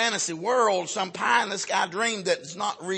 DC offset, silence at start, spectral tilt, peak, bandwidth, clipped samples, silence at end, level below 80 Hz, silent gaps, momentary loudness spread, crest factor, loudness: under 0.1%; 0 s; -2 dB/octave; -6 dBFS; 8.8 kHz; under 0.1%; 0 s; -78 dBFS; none; 6 LU; 20 dB; -25 LUFS